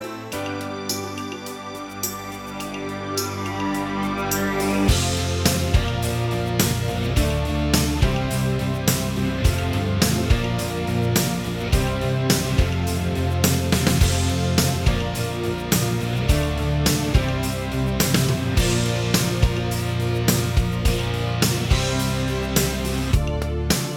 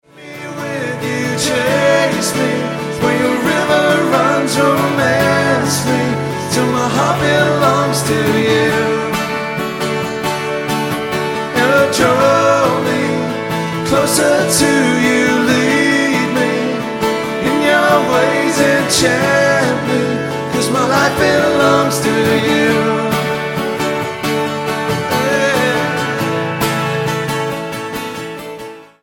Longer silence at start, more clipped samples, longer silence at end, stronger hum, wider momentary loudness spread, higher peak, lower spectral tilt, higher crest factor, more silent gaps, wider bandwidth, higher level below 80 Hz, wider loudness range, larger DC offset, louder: second, 0 s vs 0.15 s; neither; second, 0 s vs 0.15 s; neither; about the same, 8 LU vs 7 LU; about the same, -2 dBFS vs 0 dBFS; about the same, -4.5 dB/octave vs -4.5 dB/octave; first, 20 dB vs 14 dB; neither; first, 19.5 kHz vs 17.5 kHz; first, -30 dBFS vs -46 dBFS; about the same, 3 LU vs 3 LU; neither; second, -22 LUFS vs -14 LUFS